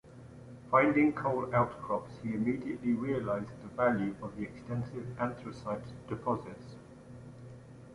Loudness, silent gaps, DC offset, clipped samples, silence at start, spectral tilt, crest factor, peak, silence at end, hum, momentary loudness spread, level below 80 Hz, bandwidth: -33 LUFS; none; under 0.1%; under 0.1%; 0.05 s; -8.5 dB/octave; 20 dB; -14 dBFS; 0 s; none; 23 LU; -62 dBFS; 11.5 kHz